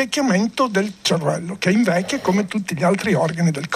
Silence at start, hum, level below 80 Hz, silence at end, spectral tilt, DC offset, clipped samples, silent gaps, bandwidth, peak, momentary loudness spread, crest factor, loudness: 0 s; none; -58 dBFS; 0 s; -5 dB/octave; under 0.1%; under 0.1%; none; 13.5 kHz; -4 dBFS; 3 LU; 14 dB; -19 LUFS